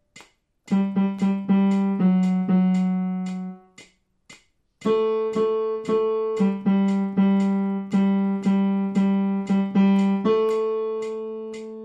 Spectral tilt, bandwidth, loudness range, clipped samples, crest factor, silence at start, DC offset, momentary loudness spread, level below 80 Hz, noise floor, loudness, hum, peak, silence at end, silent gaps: -9 dB/octave; 7.8 kHz; 4 LU; under 0.1%; 12 dB; 0.15 s; under 0.1%; 9 LU; -68 dBFS; -55 dBFS; -22 LUFS; none; -10 dBFS; 0 s; none